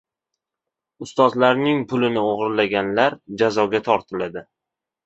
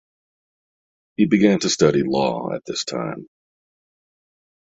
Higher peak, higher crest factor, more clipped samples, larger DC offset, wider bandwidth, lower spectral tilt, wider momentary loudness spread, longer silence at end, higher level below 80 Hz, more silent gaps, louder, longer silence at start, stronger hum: about the same, -2 dBFS vs -2 dBFS; about the same, 20 dB vs 20 dB; neither; neither; about the same, 8.2 kHz vs 8 kHz; about the same, -6 dB/octave vs -5 dB/octave; about the same, 12 LU vs 13 LU; second, 0.65 s vs 1.45 s; about the same, -60 dBFS vs -58 dBFS; neither; about the same, -20 LUFS vs -20 LUFS; second, 1 s vs 1.2 s; neither